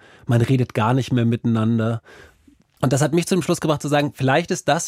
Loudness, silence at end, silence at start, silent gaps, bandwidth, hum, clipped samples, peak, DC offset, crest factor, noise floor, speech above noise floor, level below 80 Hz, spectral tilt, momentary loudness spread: -20 LUFS; 0 s; 0.3 s; none; 15.5 kHz; none; under 0.1%; -2 dBFS; under 0.1%; 18 dB; -55 dBFS; 36 dB; -54 dBFS; -6 dB/octave; 4 LU